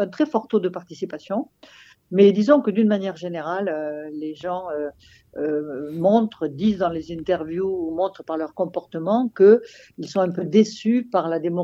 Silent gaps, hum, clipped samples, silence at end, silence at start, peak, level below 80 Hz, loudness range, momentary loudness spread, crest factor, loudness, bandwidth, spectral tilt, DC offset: none; none; under 0.1%; 0 s; 0 s; -2 dBFS; -60 dBFS; 5 LU; 14 LU; 20 dB; -22 LUFS; 7.6 kHz; -7.5 dB/octave; under 0.1%